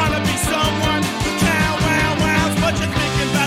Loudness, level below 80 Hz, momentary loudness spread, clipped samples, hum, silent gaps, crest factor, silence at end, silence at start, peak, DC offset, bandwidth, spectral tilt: -17 LUFS; -32 dBFS; 2 LU; under 0.1%; none; none; 14 dB; 0 s; 0 s; -4 dBFS; under 0.1%; 16.5 kHz; -4.5 dB/octave